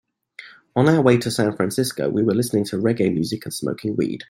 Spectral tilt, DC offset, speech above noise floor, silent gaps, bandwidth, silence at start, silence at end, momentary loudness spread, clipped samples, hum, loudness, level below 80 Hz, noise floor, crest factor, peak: -6 dB/octave; under 0.1%; 25 dB; none; 16.5 kHz; 0.4 s; 0.05 s; 10 LU; under 0.1%; none; -21 LUFS; -58 dBFS; -44 dBFS; 18 dB; -2 dBFS